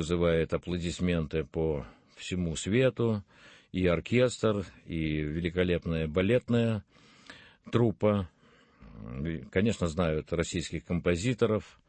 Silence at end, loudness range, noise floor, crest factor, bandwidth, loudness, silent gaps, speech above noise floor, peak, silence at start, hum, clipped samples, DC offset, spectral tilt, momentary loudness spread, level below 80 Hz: 0.2 s; 3 LU; -61 dBFS; 20 dB; 8.8 kHz; -30 LUFS; none; 32 dB; -10 dBFS; 0 s; none; under 0.1%; under 0.1%; -6.5 dB/octave; 11 LU; -48 dBFS